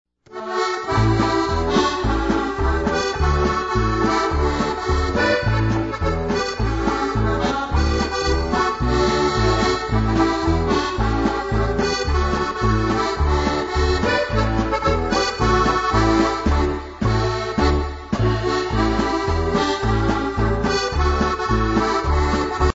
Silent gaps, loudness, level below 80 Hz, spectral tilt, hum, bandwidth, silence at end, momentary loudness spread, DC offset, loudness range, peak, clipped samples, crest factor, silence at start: none; -20 LUFS; -26 dBFS; -6 dB/octave; none; 8 kHz; 0 s; 3 LU; under 0.1%; 2 LU; -4 dBFS; under 0.1%; 14 dB; 0.3 s